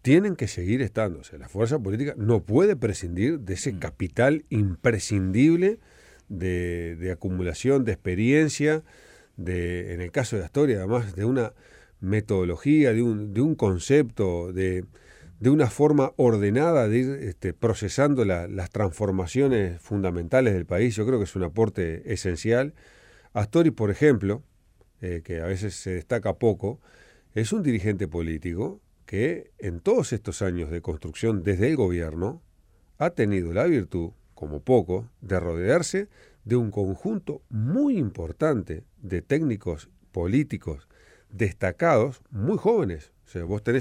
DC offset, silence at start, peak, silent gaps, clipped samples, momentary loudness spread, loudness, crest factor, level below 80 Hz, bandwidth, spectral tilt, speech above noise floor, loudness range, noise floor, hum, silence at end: under 0.1%; 0.05 s; -8 dBFS; none; under 0.1%; 12 LU; -25 LUFS; 18 dB; -46 dBFS; 12.5 kHz; -7 dB/octave; 36 dB; 5 LU; -60 dBFS; none; 0 s